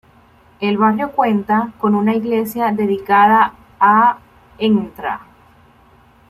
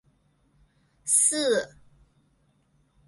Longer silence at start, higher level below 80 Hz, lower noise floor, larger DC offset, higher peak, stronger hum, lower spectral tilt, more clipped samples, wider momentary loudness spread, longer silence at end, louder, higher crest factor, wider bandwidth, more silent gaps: second, 0.6 s vs 1.05 s; first, -54 dBFS vs -66 dBFS; second, -49 dBFS vs -67 dBFS; neither; first, -2 dBFS vs -6 dBFS; neither; first, -7 dB/octave vs -0.5 dB/octave; neither; second, 12 LU vs 19 LU; second, 1.1 s vs 1.4 s; first, -16 LUFS vs -22 LUFS; second, 16 dB vs 24 dB; first, 15 kHz vs 12 kHz; neither